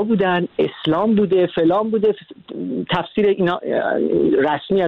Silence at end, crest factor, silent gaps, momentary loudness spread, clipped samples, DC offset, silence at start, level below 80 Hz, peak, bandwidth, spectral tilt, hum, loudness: 0 s; 12 dB; none; 8 LU; under 0.1%; under 0.1%; 0 s; -54 dBFS; -6 dBFS; 4.7 kHz; -9 dB/octave; none; -18 LUFS